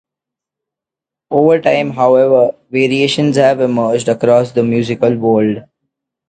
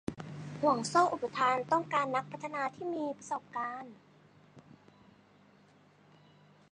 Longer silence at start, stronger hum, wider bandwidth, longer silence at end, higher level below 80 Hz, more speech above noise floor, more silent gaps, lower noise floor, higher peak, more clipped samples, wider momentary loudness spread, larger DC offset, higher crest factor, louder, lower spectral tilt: first, 1.3 s vs 0.1 s; neither; about the same, 9.2 kHz vs 10 kHz; second, 0.7 s vs 2.15 s; first, -56 dBFS vs -72 dBFS; first, 74 dB vs 30 dB; neither; first, -85 dBFS vs -63 dBFS; first, 0 dBFS vs -12 dBFS; neither; second, 5 LU vs 14 LU; neither; second, 14 dB vs 22 dB; first, -12 LUFS vs -33 LUFS; first, -6 dB/octave vs -4.5 dB/octave